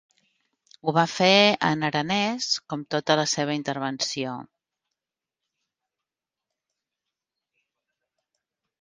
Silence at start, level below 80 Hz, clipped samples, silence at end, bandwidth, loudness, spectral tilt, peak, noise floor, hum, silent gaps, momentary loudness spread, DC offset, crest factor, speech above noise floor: 0.85 s; -70 dBFS; under 0.1%; 4.4 s; 10 kHz; -23 LUFS; -3.5 dB/octave; -4 dBFS; -89 dBFS; none; none; 12 LU; under 0.1%; 24 dB; 65 dB